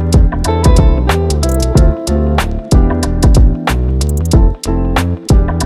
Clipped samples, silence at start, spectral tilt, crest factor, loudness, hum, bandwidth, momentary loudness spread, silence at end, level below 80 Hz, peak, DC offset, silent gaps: 0.4%; 0 s; -6 dB/octave; 10 dB; -12 LUFS; none; 14.5 kHz; 5 LU; 0 s; -12 dBFS; 0 dBFS; under 0.1%; none